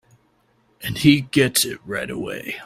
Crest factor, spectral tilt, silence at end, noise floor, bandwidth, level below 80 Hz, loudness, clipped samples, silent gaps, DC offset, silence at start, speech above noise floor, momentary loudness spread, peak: 22 dB; -4 dB/octave; 0 s; -62 dBFS; 16 kHz; -52 dBFS; -20 LUFS; under 0.1%; none; under 0.1%; 0.8 s; 42 dB; 12 LU; 0 dBFS